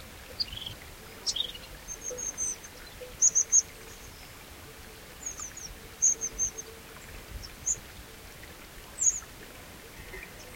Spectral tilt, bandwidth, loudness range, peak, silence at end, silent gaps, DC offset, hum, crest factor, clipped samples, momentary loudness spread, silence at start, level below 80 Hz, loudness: 0 dB/octave; 16.5 kHz; 5 LU; -12 dBFS; 0 s; none; under 0.1%; none; 22 dB; under 0.1%; 22 LU; 0 s; -52 dBFS; -28 LUFS